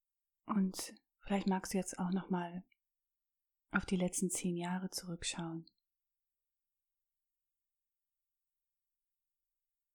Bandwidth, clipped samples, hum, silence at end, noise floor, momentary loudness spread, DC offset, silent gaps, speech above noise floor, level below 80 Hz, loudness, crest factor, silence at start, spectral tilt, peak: 19 kHz; under 0.1%; none; 4.3 s; under -90 dBFS; 10 LU; under 0.1%; none; over 52 dB; -66 dBFS; -38 LUFS; 22 dB; 0.45 s; -4.5 dB/octave; -18 dBFS